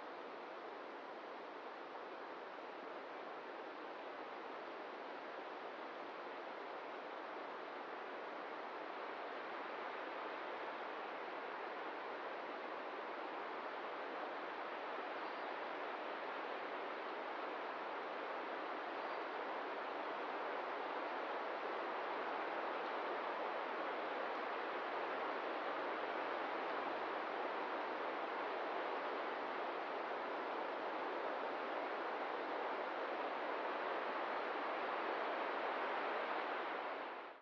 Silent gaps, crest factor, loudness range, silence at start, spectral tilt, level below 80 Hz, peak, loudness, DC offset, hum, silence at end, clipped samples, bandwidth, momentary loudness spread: none; 16 dB; 7 LU; 0 s; 0 dB/octave; under -90 dBFS; -30 dBFS; -44 LUFS; under 0.1%; none; 0 s; under 0.1%; 7.4 kHz; 8 LU